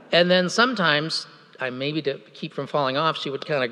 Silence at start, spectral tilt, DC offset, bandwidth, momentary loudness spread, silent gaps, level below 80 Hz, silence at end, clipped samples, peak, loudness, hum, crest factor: 0.1 s; -4.5 dB/octave; under 0.1%; 11.5 kHz; 14 LU; none; -84 dBFS; 0 s; under 0.1%; -4 dBFS; -23 LUFS; none; 20 dB